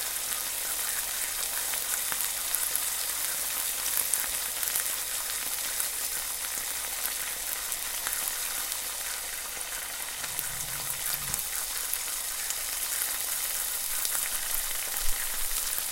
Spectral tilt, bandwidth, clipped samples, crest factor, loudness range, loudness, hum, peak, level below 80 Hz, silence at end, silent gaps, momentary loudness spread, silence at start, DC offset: 1.5 dB/octave; 17 kHz; under 0.1%; 28 dB; 3 LU; -29 LUFS; none; -4 dBFS; -48 dBFS; 0 s; none; 4 LU; 0 s; under 0.1%